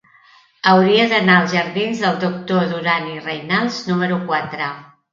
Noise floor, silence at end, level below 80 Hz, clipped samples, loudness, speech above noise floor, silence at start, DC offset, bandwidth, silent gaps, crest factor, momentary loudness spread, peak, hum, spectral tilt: -51 dBFS; 0.3 s; -62 dBFS; under 0.1%; -17 LUFS; 33 dB; 0.65 s; under 0.1%; 7.4 kHz; none; 18 dB; 12 LU; 0 dBFS; none; -5.5 dB/octave